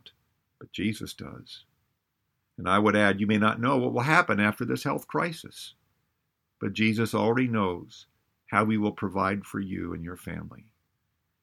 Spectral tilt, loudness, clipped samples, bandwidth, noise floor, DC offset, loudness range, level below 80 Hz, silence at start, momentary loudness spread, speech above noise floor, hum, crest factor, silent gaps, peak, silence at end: -6 dB/octave; -26 LUFS; under 0.1%; 15.5 kHz; -79 dBFS; under 0.1%; 6 LU; -62 dBFS; 0.6 s; 19 LU; 52 dB; none; 24 dB; none; -4 dBFS; 0.85 s